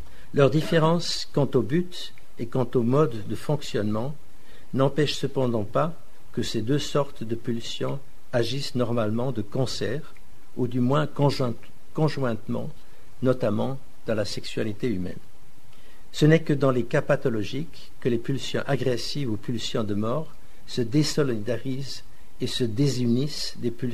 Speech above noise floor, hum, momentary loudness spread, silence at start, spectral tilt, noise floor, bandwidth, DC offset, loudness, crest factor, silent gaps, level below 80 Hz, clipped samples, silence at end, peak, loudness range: 27 dB; none; 12 LU; 0 s; -6 dB/octave; -53 dBFS; 13.5 kHz; 4%; -26 LUFS; 22 dB; none; -52 dBFS; under 0.1%; 0 s; -4 dBFS; 4 LU